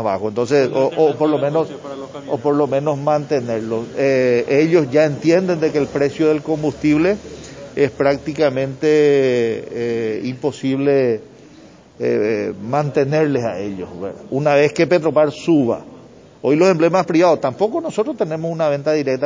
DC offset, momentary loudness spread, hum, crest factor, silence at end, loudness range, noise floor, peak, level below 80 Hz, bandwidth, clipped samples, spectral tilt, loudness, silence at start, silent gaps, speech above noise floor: under 0.1%; 10 LU; none; 16 dB; 0 s; 3 LU; -44 dBFS; -2 dBFS; -54 dBFS; 7.6 kHz; under 0.1%; -6.5 dB/octave; -17 LUFS; 0 s; none; 27 dB